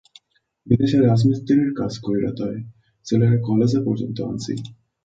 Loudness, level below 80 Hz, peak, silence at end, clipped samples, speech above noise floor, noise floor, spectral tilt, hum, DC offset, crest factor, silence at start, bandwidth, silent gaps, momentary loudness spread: -20 LUFS; -52 dBFS; -4 dBFS; 0.3 s; under 0.1%; 41 dB; -60 dBFS; -8 dB/octave; none; under 0.1%; 18 dB; 0.65 s; 7.8 kHz; none; 14 LU